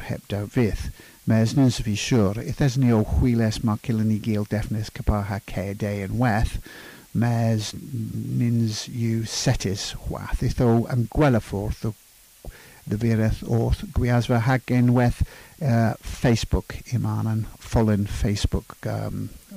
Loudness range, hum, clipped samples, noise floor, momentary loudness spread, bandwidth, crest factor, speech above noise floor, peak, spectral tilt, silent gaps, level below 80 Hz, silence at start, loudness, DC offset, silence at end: 4 LU; none; under 0.1%; -43 dBFS; 11 LU; 15.5 kHz; 14 dB; 20 dB; -10 dBFS; -6.5 dB/octave; none; -34 dBFS; 0 s; -24 LUFS; under 0.1%; 0 s